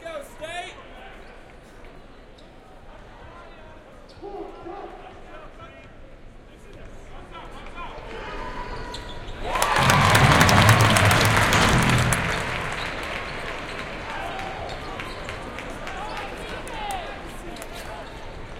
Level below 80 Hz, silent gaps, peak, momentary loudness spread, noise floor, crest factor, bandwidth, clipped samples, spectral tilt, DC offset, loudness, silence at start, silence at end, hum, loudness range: -38 dBFS; none; -2 dBFS; 27 LU; -46 dBFS; 24 dB; 17 kHz; under 0.1%; -4 dB/octave; under 0.1%; -22 LUFS; 0 s; 0 s; none; 24 LU